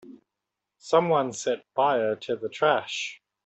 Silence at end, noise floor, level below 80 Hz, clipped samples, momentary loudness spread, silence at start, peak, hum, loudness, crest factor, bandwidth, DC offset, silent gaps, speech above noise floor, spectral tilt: 0.3 s; -85 dBFS; -74 dBFS; under 0.1%; 9 LU; 0.05 s; -6 dBFS; none; -26 LUFS; 20 dB; 8.4 kHz; under 0.1%; none; 60 dB; -4 dB/octave